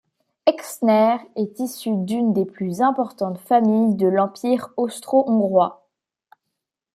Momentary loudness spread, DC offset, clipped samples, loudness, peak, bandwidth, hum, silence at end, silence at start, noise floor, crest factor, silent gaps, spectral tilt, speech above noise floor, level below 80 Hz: 9 LU; under 0.1%; under 0.1%; -20 LUFS; -2 dBFS; 15.5 kHz; none; 1.2 s; 0.45 s; -81 dBFS; 18 dB; none; -6.5 dB/octave; 61 dB; -70 dBFS